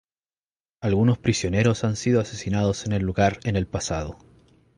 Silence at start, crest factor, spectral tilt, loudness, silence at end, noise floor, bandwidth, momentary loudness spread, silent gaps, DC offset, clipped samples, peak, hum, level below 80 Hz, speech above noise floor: 0.8 s; 18 dB; -6 dB/octave; -24 LUFS; 0.65 s; under -90 dBFS; 11 kHz; 7 LU; none; under 0.1%; under 0.1%; -6 dBFS; none; -42 dBFS; over 67 dB